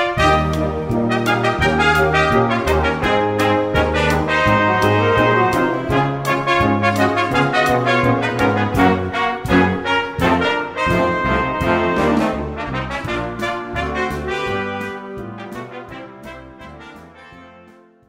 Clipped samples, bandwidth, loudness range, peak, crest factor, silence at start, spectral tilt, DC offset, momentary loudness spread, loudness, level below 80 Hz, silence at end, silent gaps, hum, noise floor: under 0.1%; 16 kHz; 9 LU; 0 dBFS; 16 dB; 0 s; -6 dB/octave; under 0.1%; 16 LU; -17 LUFS; -34 dBFS; 0.6 s; none; none; -46 dBFS